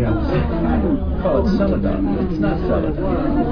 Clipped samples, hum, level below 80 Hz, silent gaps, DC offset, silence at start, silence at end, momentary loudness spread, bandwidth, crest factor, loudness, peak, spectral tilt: under 0.1%; none; -24 dBFS; none; under 0.1%; 0 s; 0 s; 3 LU; 5.4 kHz; 12 dB; -19 LUFS; -4 dBFS; -10 dB/octave